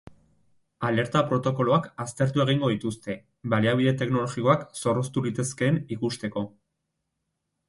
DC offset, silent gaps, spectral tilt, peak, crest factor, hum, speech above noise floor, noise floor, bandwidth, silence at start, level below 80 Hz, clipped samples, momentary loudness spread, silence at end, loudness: under 0.1%; none; -6 dB/octave; -8 dBFS; 20 dB; none; 55 dB; -80 dBFS; 11.5 kHz; 0.05 s; -60 dBFS; under 0.1%; 9 LU; 1.2 s; -26 LUFS